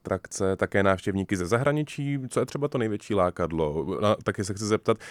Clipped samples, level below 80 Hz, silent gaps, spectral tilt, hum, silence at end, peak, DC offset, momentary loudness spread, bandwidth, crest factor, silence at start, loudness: under 0.1%; -52 dBFS; none; -6 dB/octave; none; 0 s; -8 dBFS; under 0.1%; 5 LU; 14.5 kHz; 18 dB; 0.05 s; -27 LUFS